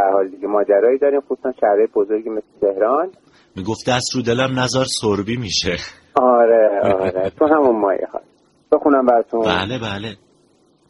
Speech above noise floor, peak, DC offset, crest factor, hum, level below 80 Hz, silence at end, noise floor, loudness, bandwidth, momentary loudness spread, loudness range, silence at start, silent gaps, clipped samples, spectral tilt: 39 dB; 0 dBFS; under 0.1%; 16 dB; none; -50 dBFS; 0.75 s; -56 dBFS; -17 LUFS; 11.5 kHz; 12 LU; 3 LU; 0 s; none; under 0.1%; -4.5 dB/octave